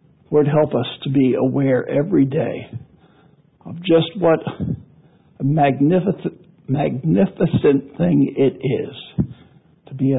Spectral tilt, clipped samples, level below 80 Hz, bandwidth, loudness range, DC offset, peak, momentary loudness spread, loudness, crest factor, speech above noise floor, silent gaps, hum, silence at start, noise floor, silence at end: -13 dB/octave; under 0.1%; -48 dBFS; 4 kHz; 3 LU; under 0.1%; -4 dBFS; 11 LU; -19 LUFS; 14 dB; 36 dB; none; none; 0.3 s; -53 dBFS; 0 s